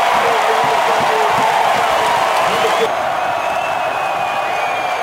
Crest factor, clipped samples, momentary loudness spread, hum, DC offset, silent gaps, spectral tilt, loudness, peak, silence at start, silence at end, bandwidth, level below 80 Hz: 12 dB; under 0.1%; 4 LU; none; under 0.1%; none; -2.5 dB/octave; -15 LUFS; -2 dBFS; 0 s; 0 s; 16.5 kHz; -54 dBFS